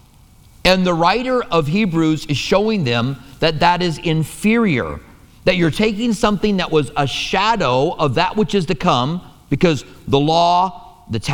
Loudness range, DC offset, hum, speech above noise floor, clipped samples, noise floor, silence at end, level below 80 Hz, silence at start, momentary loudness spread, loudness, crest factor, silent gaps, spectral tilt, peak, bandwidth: 1 LU; under 0.1%; none; 30 dB; under 0.1%; -47 dBFS; 0 s; -38 dBFS; 0.65 s; 7 LU; -17 LUFS; 16 dB; none; -5.5 dB/octave; 0 dBFS; 18.5 kHz